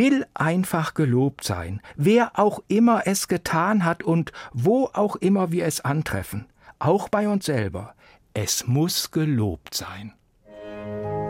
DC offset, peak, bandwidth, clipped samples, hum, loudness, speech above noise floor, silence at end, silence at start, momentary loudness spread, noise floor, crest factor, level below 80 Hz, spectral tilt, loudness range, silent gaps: under 0.1%; -6 dBFS; 16.5 kHz; under 0.1%; none; -23 LUFS; 21 dB; 0 s; 0 s; 15 LU; -44 dBFS; 16 dB; -52 dBFS; -5.5 dB/octave; 4 LU; none